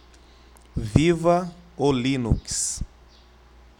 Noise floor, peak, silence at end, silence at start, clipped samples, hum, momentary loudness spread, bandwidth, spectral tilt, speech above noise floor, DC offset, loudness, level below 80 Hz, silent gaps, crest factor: -51 dBFS; 0 dBFS; 0.95 s; 0.75 s; under 0.1%; none; 15 LU; 17 kHz; -5 dB/octave; 30 dB; under 0.1%; -23 LUFS; -36 dBFS; none; 24 dB